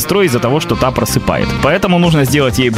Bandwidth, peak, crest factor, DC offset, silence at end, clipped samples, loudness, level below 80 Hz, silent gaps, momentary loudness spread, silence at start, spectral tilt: 16 kHz; 0 dBFS; 12 dB; 0.2%; 0 s; under 0.1%; -12 LUFS; -30 dBFS; none; 3 LU; 0 s; -5.5 dB/octave